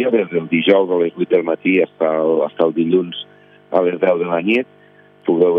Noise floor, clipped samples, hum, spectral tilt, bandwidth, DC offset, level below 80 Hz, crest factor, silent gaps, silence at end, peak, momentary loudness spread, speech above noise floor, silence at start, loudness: -47 dBFS; under 0.1%; 50 Hz at -55 dBFS; -8.5 dB/octave; 5 kHz; under 0.1%; -72 dBFS; 16 dB; none; 0 s; 0 dBFS; 8 LU; 31 dB; 0 s; -17 LUFS